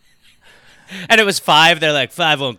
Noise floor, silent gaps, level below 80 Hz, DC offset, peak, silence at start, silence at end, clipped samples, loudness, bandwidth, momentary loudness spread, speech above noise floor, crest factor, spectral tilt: -50 dBFS; none; -58 dBFS; under 0.1%; -2 dBFS; 0.9 s; 0.05 s; under 0.1%; -12 LUFS; 19 kHz; 14 LU; 35 dB; 14 dB; -2.5 dB/octave